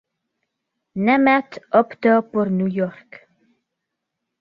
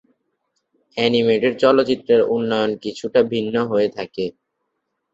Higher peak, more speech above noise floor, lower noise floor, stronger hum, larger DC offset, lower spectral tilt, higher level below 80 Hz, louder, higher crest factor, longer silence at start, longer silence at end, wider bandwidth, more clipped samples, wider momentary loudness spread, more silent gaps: about the same, -2 dBFS vs -2 dBFS; first, 62 dB vs 57 dB; first, -80 dBFS vs -75 dBFS; neither; neither; first, -9 dB/octave vs -6 dB/octave; about the same, -64 dBFS vs -60 dBFS; about the same, -19 LUFS vs -19 LUFS; about the same, 20 dB vs 18 dB; about the same, 0.95 s vs 0.95 s; first, 1.5 s vs 0.85 s; second, 6.8 kHz vs 7.8 kHz; neither; about the same, 9 LU vs 11 LU; neither